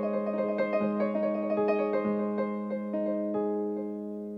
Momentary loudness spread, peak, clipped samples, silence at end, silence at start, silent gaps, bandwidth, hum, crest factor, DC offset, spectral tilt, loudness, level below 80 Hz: 6 LU; -16 dBFS; under 0.1%; 0 s; 0 s; none; 5.4 kHz; none; 14 dB; under 0.1%; -9.5 dB/octave; -30 LUFS; -72 dBFS